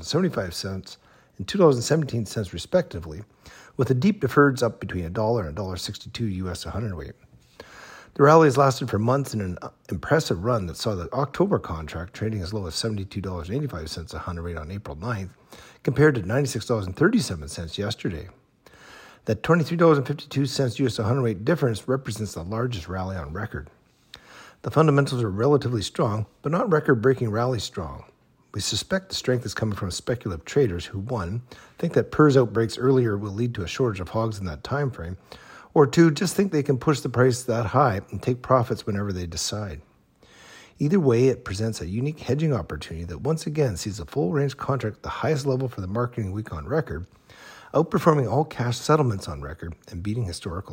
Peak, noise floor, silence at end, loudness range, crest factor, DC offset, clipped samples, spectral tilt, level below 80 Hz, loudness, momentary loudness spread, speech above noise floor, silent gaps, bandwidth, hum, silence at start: -4 dBFS; -56 dBFS; 0 s; 5 LU; 20 dB; under 0.1%; under 0.1%; -6 dB/octave; -48 dBFS; -24 LUFS; 15 LU; 32 dB; none; 16.5 kHz; none; 0 s